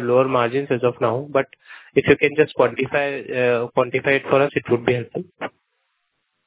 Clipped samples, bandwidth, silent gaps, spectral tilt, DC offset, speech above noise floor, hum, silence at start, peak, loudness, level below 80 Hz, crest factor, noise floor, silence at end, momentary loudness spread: under 0.1%; 4 kHz; none; -10 dB/octave; under 0.1%; 53 dB; none; 0 s; 0 dBFS; -20 LUFS; -56 dBFS; 20 dB; -73 dBFS; 1 s; 11 LU